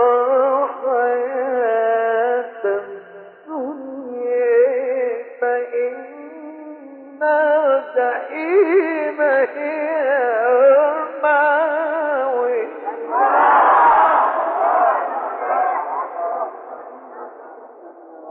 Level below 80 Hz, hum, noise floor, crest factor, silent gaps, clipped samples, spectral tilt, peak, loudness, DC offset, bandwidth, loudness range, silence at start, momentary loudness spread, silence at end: -68 dBFS; none; -40 dBFS; 14 dB; none; under 0.1%; -1 dB/octave; -4 dBFS; -18 LUFS; under 0.1%; 4.3 kHz; 6 LU; 0 s; 22 LU; 0 s